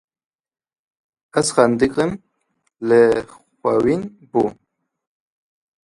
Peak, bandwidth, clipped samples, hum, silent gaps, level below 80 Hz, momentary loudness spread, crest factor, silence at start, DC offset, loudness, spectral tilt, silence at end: 0 dBFS; 11.5 kHz; under 0.1%; none; none; -54 dBFS; 10 LU; 20 dB; 1.35 s; under 0.1%; -19 LUFS; -5 dB/octave; 1.3 s